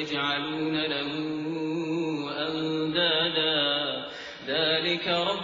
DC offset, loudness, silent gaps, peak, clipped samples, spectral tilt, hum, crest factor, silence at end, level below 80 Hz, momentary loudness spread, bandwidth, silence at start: under 0.1%; -27 LUFS; none; -12 dBFS; under 0.1%; -5 dB/octave; none; 16 dB; 0 s; -66 dBFS; 8 LU; 7.6 kHz; 0 s